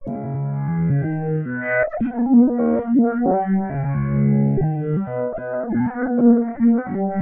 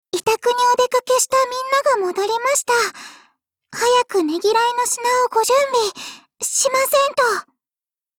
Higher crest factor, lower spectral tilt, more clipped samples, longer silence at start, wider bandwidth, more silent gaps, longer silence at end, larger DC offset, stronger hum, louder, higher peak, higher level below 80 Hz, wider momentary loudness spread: about the same, 14 dB vs 14 dB; first, -11 dB/octave vs -0.5 dB/octave; neither; second, 0 s vs 0.15 s; second, 2.7 kHz vs over 20 kHz; neither; second, 0 s vs 0.75 s; neither; neither; about the same, -20 LUFS vs -18 LUFS; about the same, -4 dBFS vs -4 dBFS; first, -46 dBFS vs -62 dBFS; about the same, 9 LU vs 8 LU